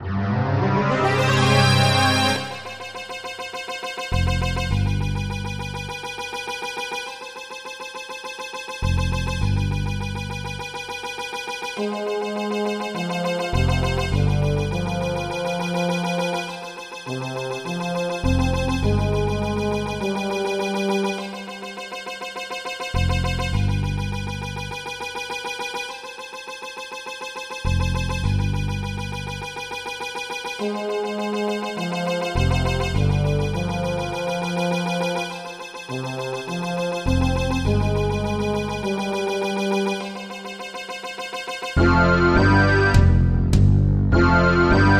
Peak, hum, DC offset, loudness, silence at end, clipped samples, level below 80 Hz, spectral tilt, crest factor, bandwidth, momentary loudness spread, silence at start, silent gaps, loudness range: -2 dBFS; none; under 0.1%; -23 LUFS; 0 s; under 0.1%; -32 dBFS; -6 dB/octave; 20 dB; 15 kHz; 14 LU; 0 s; none; 7 LU